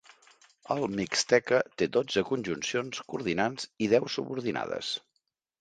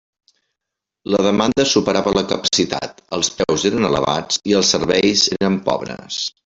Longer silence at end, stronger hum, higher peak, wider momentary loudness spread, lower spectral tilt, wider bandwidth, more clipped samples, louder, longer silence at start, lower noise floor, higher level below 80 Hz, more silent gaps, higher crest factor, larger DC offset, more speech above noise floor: first, 0.6 s vs 0.15 s; neither; second, -10 dBFS vs -2 dBFS; about the same, 9 LU vs 9 LU; about the same, -4 dB/octave vs -3.5 dB/octave; first, 9.4 kHz vs 8.2 kHz; neither; second, -29 LUFS vs -17 LUFS; second, 0.7 s vs 1.05 s; second, -79 dBFS vs -83 dBFS; second, -66 dBFS vs -48 dBFS; neither; first, 22 dB vs 16 dB; neither; second, 50 dB vs 65 dB